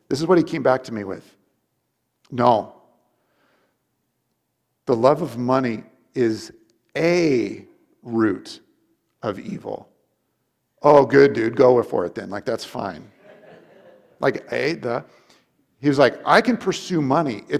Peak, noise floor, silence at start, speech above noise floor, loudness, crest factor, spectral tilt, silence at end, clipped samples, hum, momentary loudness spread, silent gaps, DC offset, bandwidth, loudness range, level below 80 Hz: 0 dBFS; -74 dBFS; 0.1 s; 54 dB; -20 LUFS; 20 dB; -6 dB/octave; 0 s; under 0.1%; none; 18 LU; none; under 0.1%; 14 kHz; 8 LU; -62 dBFS